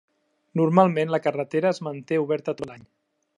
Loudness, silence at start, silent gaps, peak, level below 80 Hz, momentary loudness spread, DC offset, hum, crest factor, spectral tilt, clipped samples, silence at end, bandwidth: -24 LUFS; 0.55 s; none; -2 dBFS; -70 dBFS; 13 LU; under 0.1%; none; 22 dB; -7.5 dB/octave; under 0.1%; 0.55 s; 11 kHz